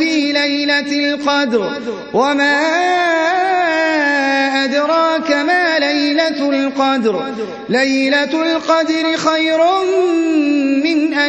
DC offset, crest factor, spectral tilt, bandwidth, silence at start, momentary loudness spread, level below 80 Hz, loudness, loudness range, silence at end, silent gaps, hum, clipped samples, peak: under 0.1%; 14 dB; -3.5 dB/octave; 8.6 kHz; 0 s; 4 LU; -62 dBFS; -14 LUFS; 1 LU; 0 s; none; none; under 0.1%; -2 dBFS